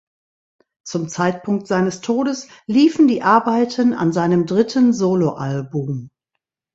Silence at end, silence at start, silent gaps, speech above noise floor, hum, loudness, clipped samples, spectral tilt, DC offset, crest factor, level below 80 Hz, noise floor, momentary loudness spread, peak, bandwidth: 0.65 s; 0.85 s; none; 62 dB; none; -18 LUFS; under 0.1%; -6.5 dB/octave; under 0.1%; 18 dB; -60 dBFS; -79 dBFS; 11 LU; 0 dBFS; 8 kHz